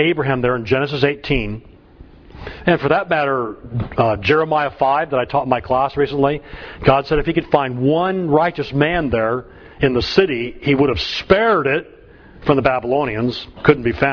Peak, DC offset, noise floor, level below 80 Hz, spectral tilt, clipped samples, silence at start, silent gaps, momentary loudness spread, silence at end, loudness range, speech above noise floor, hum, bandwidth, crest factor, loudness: 0 dBFS; under 0.1%; -43 dBFS; -38 dBFS; -7.5 dB/octave; under 0.1%; 0 s; none; 7 LU; 0 s; 2 LU; 26 dB; none; 5.4 kHz; 18 dB; -18 LUFS